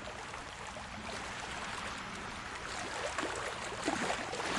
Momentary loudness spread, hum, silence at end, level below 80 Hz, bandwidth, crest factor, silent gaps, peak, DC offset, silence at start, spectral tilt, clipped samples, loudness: 8 LU; none; 0 s; -58 dBFS; 11.5 kHz; 20 dB; none; -20 dBFS; under 0.1%; 0 s; -2.5 dB/octave; under 0.1%; -39 LUFS